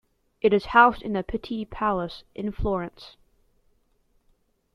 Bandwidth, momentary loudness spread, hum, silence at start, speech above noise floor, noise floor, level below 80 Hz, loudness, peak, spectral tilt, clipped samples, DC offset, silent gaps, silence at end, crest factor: 11 kHz; 16 LU; none; 0.45 s; 42 dB; -66 dBFS; -44 dBFS; -24 LUFS; -4 dBFS; -7.5 dB/octave; under 0.1%; under 0.1%; none; 1.65 s; 22 dB